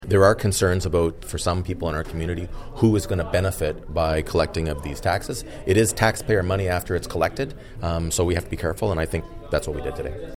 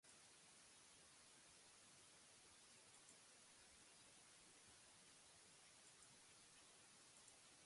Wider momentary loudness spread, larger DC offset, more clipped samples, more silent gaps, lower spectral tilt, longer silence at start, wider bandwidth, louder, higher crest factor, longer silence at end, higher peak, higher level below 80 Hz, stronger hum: first, 10 LU vs 1 LU; neither; neither; neither; first, -5.5 dB/octave vs -1 dB/octave; about the same, 0 s vs 0.05 s; first, 17 kHz vs 11.5 kHz; first, -24 LUFS vs -66 LUFS; about the same, 20 dB vs 20 dB; about the same, 0.05 s vs 0 s; first, -2 dBFS vs -50 dBFS; first, -36 dBFS vs under -90 dBFS; neither